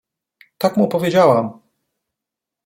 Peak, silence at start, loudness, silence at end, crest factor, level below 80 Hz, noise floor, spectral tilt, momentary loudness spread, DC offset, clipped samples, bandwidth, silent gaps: -2 dBFS; 0.6 s; -16 LUFS; 1.15 s; 18 dB; -62 dBFS; -85 dBFS; -6.5 dB/octave; 8 LU; under 0.1%; under 0.1%; 16.5 kHz; none